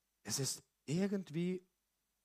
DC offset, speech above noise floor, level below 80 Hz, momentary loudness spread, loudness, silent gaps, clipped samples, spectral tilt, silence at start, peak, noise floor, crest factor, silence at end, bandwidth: under 0.1%; 47 dB; -80 dBFS; 6 LU; -40 LUFS; none; under 0.1%; -4.5 dB/octave; 0.25 s; -24 dBFS; -85 dBFS; 16 dB; 0.65 s; 15.5 kHz